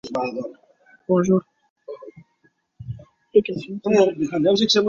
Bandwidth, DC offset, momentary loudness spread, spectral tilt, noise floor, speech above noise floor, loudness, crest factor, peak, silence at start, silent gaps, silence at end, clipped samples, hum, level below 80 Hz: 7.6 kHz; under 0.1%; 21 LU; -5.5 dB/octave; -64 dBFS; 45 dB; -21 LUFS; 18 dB; -4 dBFS; 0.05 s; 1.70-1.76 s; 0 s; under 0.1%; none; -58 dBFS